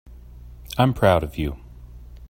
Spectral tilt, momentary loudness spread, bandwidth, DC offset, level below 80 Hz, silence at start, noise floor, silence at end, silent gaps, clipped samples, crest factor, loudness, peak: -7 dB/octave; 14 LU; 16.5 kHz; under 0.1%; -38 dBFS; 0.1 s; -41 dBFS; 0 s; none; under 0.1%; 22 dB; -21 LUFS; -2 dBFS